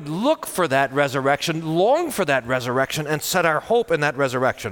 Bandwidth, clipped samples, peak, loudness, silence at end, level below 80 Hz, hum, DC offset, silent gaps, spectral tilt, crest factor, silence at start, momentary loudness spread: 19 kHz; under 0.1%; -6 dBFS; -21 LUFS; 0 s; -56 dBFS; none; under 0.1%; none; -4.5 dB/octave; 16 dB; 0 s; 3 LU